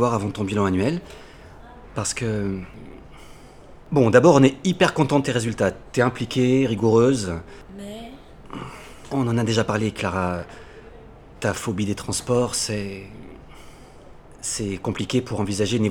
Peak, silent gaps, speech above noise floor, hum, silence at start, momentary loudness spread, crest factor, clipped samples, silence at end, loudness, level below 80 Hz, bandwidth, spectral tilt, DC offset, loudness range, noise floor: 0 dBFS; none; 23 dB; none; 0 s; 21 LU; 22 dB; under 0.1%; 0 s; -22 LUFS; -48 dBFS; 17.5 kHz; -5.5 dB/octave; under 0.1%; 8 LU; -44 dBFS